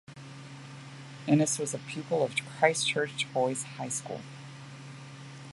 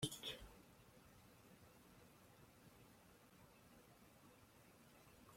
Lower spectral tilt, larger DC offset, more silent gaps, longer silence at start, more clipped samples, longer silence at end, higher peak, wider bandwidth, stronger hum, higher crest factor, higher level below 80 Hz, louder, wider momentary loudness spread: about the same, -4 dB/octave vs -3.5 dB/octave; neither; neither; about the same, 0.1 s vs 0 s; neither; about the same, 0 s vs 0 s; first, -8 dBFS vs -28 dBFS; second, 11.5 kHz vs 16.5 kHz; neither; second, 24 dB vs 30 dB; about the same, -74 dBFS vs -74 dBFS; first, -30 LUFS vs -61 LUFS; first, 20 LU vs 13 LU